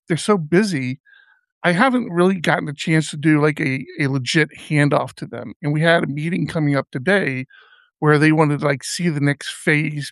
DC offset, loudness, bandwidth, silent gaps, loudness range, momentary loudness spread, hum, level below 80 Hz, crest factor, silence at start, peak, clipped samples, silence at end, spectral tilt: under 0.1%; -19 LUFS; 12 kHz; 1.00-1.04 s, 1.52-1.61 s, 5.56-5.60 s; 1 LU; 8 LU; none; -62 dBFS; 18 dB; 0.1 s; -2 dBFS; under 0.1%; 0 s; -6 dB/octave